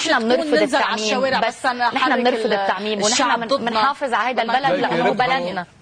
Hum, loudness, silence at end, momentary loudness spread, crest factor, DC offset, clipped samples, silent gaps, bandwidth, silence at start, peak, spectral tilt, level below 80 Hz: none; -19 LUFS; 0.15 s; 3 LU; 12 dB; under 0.1%; under 0.1%; none; 10.5 kHz; 0 s; -6 dBFS; -3 dB/octave; -60 dBFS